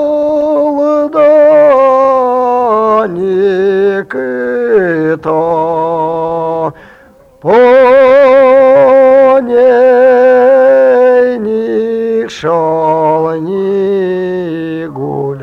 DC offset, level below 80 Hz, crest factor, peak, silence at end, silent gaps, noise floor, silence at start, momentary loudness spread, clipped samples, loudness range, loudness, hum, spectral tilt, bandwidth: under 0.1%; -50 dBFS; 8 dB; -2 dBFS; 0 s; none; -40 dBFS; 0 s; 10 LU; under 0.1%; 7 LU; -9 LUFS; none; -7.5 dB/octave; 6.8 kHz